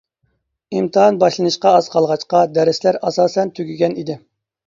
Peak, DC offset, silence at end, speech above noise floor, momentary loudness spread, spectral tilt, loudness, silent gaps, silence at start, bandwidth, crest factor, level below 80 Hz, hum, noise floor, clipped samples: 0 dBFS; under 0.1%; 0.5 s; 52 dB; 10 LU; -5.5 dB/octave; -16 LUFS; none; 0.7 s; 7.6 kHz; 16 dB; -64 dBFS; none; -67 dBFS; under 0.1%